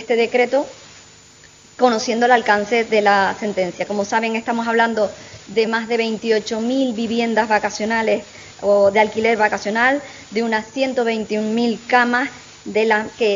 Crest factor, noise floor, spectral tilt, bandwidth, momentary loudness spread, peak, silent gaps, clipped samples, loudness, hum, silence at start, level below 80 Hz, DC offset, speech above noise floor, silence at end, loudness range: 18 dB; -46 dBFS; -4 dB/octave; 7.6 kHz; 8 LU; 0 dBFS; none; under 0.1%; -18 LUFS; none; 0 s; -60 dBFS; under 0.1%; 28 dB; 0 s; 2 LU